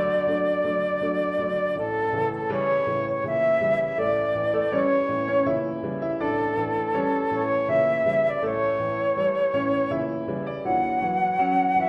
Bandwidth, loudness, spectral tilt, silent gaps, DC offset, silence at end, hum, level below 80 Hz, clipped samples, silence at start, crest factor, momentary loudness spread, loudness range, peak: 5.8 kHz; -24 LUFS; -8.5 dB/octave; none; under 0.1%; 0 s; none; -58 dBFS; under 0.1%; 0 s; 12 dB; 4 LU; 1 LU; -12 dBFS